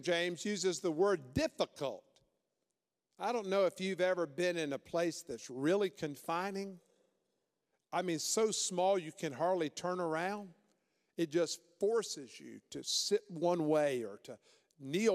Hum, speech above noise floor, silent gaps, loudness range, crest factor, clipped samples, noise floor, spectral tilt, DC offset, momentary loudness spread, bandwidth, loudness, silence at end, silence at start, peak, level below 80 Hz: none; 53 dB; none; 3 LU; 18 dB; under 0.1%; -89 dBFS; -4 dB/octave; under 0.1%; 13 LU; 15.5 kHz; -36 LUFS; 0 s; 0 s; -20 dBFS; -72 dBFS